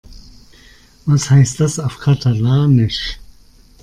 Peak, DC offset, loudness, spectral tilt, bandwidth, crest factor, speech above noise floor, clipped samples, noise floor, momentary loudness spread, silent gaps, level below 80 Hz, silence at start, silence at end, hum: -2 dBFS; under 0.1%; -15 LUFS; -6 dB/octave; 11 kHz; 14 dB; 32 dB; under 0.1%; -45 dBFS; 13 LU; none; -40 dBFS; 0.1 s; 0.6 s; none